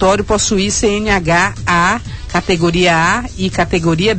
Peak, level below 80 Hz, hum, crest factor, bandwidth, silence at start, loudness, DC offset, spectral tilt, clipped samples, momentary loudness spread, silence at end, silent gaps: -2 dBFS; -30 dBFS; none; 12 dB; 9 kHz; 0 s; -14 LUFS; 0.9%; -4 dB/octave; under 0.1%; 6 LU; 0 s; none